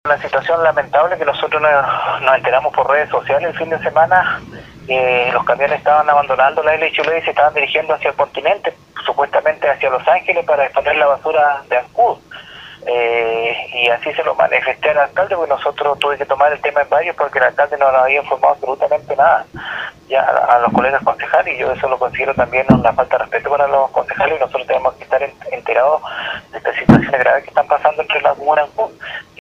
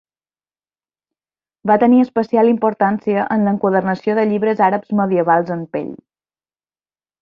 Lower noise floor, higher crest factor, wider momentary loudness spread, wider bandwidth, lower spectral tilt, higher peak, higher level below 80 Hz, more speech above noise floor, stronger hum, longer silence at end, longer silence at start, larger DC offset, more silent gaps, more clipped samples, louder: second, -35 dBFS vs under -90 dBFS; about the same, 14 dB vs 16 dB; second, 7 LU vs 10 LU; first, 8.8 kHz vs 5.6 kHz; second, -6.5 dB/octave vs -9.5 dB/octave; about the same, 0 dBFS vs -2 dBFS; first, -46 dBFS vs -62 dBFS; second, 21 dB vs over 75 dB; neither; second, 0.2 s vs 1.25 s; second, 0.05 s vs 1.65 s; neither; neither; neither; about the same, -15 LUFS vs -16 LUFS